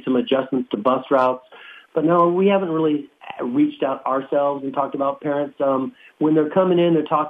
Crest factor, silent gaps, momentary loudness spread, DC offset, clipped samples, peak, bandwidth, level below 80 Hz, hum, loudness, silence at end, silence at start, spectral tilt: 14 dB; none; 8 LU; under 0.1%; under 0.1%; -6 dBFS; 4.6 kHz; -70 dBFS; none; -20 LUFS; 0 s; 0.05 s; -9 dB/octave